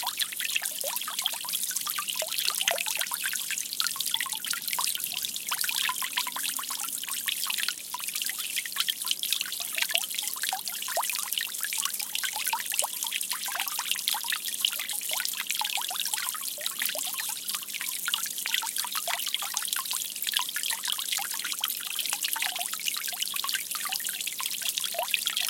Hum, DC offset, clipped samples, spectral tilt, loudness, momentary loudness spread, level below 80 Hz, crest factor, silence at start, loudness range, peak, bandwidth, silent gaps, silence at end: none; under 0.1%; under 0.1%; 2.5 dB/octave; -28 LUFS; 3 LU; -86 dBFS; 28 dB; 0 s; 1 LU; -4 dBFS; 17 kHz; none; 0 s